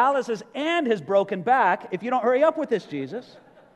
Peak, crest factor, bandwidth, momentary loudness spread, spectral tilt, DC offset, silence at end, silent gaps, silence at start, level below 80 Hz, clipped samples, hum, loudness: -8 dBFS; 16 dB; 9.8 kHz; 12 LU; -5.5 dB/octave; under 0.1%; 0.4 s; none; 0 s; -76 dBFS; under 0.1%; none; -23 LUFS